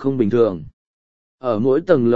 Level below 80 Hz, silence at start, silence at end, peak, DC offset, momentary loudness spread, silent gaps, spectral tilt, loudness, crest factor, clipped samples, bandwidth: -52 dBFS; 0 s; 0 s; -2 dBFS; under 0.1%; 11 LU; 0.73-1.38 s; -9.5 dB/octave; -18 LUFS; 18 dB; under 0.1%; 7 kHz